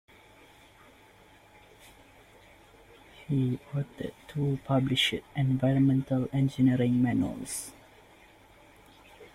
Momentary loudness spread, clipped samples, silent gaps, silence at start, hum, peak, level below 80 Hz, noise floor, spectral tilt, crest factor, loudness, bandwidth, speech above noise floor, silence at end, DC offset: 12 LU; under 0.1%; none; 3.2 s; none; -14 dBFS; -58 dBFS; -57 dBFS; -6 dB/octave; 18 dB; -28 LUFS; 15.5 kHz; 29 dB; 0.1 s; under 0.1%